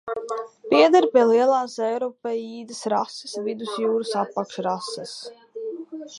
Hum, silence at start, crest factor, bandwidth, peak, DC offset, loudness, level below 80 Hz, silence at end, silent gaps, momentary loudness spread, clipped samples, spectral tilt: none; 0.05 s; 18 dB; 11.5 kHz; -4 dBFS; under 0.1%; -22 LUFS; -78 dBFS; 0 s; none; 18 LU; under 0.1%; -4.5 dB/octave